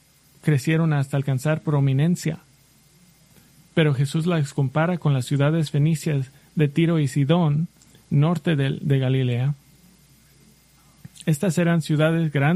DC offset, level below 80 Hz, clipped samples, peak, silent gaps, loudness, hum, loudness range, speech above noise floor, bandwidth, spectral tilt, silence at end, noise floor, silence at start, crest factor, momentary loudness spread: under 0.1%; -58 dBFS; under 0.1%; -6 dBFS; none; -22 LUFS; none; 3 LU; 35 dB; 13.5 kHz; -7 dB/octave; 0 s; -56 dBFS; 0.45 s; 16 dB; 6 LU